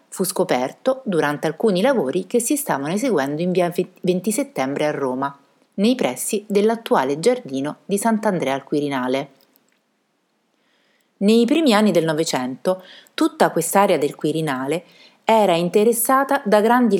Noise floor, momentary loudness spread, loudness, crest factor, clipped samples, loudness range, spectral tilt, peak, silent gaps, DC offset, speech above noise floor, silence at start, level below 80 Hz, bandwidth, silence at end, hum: -68 dBFS; 8 LU; -20 LUFS; 18 dB; under 0.1%; 5 LU; -4.5 dB/octave; -2 dBFS; none; under 0.1%; 49 dB; 0.1 s; -78 dBFS; 18 kHz; 0 s; none